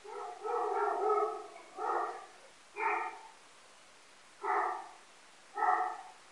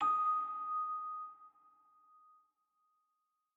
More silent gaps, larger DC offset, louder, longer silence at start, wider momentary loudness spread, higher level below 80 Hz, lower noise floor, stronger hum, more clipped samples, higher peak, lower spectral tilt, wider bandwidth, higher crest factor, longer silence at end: neither; neither; about the same, -35 LUFS vs -37 LUFS; about the same, 0 s vs 0 s; first, 21 LU vs 17 LU; about the same, -90 dBFS vs under -90 dBFS; second, -60 dBFS vs -85 dBFS; neither; neither; first, -16 dBFS vs -26 dBFS; about the same, -2 dB/octave vs -1.5 dB/octave; first, 11.5 kHz vs 7.4 kHz; about the same, 20 dB vs 16 dB; second, 0 s vs 2.05 s